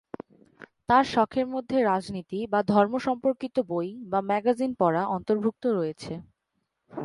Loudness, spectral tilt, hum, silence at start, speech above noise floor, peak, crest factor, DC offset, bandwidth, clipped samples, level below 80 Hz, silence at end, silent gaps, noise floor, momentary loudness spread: -26 LUFS; -7 dB/octave; none; 0.9 s; 53 dB; -8 dBFS; 20 dB; under 0.1%; 11.5 kHz; under 0.1%; -62 dBFS; 0 s; none; -79 dBFS; 15 LU